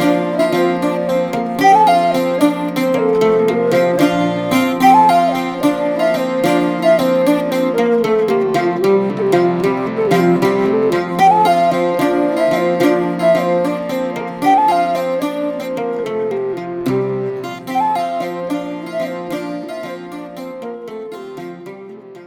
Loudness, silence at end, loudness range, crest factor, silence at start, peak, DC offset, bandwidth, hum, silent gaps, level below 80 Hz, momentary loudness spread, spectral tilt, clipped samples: -15 LUFS; 0 s; 8 LU; 16 dB; 0 s; 0 dBFS; under 0.1%; 19 kHz; none; none; -54 dBFS; 15 LU; -6 dB/octave; under 0.1%